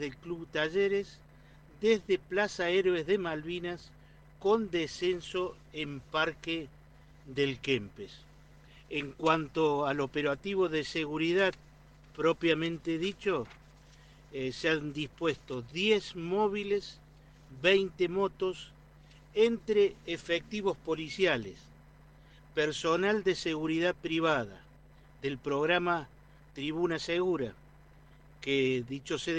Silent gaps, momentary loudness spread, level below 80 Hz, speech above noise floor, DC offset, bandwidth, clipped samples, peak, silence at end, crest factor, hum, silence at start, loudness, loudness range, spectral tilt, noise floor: none; 11 LU; -60 dBFS; 26 dB; under 0.1%; 9.4 kHz; under 0.1%; -12 dBFS; 0 s; 20 dB; none; 0 s; -31 LUFS; 3 LU; -5 dB/octave; -57 dBFS